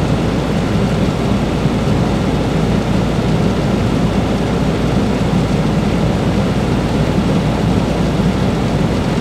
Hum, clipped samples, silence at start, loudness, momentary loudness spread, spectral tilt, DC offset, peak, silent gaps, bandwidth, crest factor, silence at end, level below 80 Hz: none; under 0.1%; 0 s; -15 LUFS; 1 LU; -7 dB/octave; under 0.1%; 0 dBFS; none; 14 kHz; 14 dB; 0 s; -26 dBFS